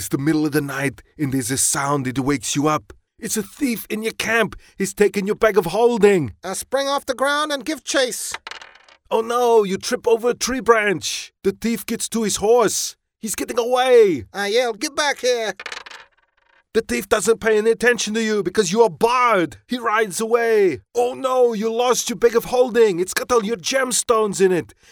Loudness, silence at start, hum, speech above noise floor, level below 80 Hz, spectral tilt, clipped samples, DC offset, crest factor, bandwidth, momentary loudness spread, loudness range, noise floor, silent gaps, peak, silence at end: -19 LUFS; 0 s; none; 41 dB; -52 dBFS; -3.5 dB/octave; under 0.1%; under 0.1%; 20 dB; over 20 kHz; 9 LU; 3 LU; -60 dBFS; none; 0 dBFS; 0.25 s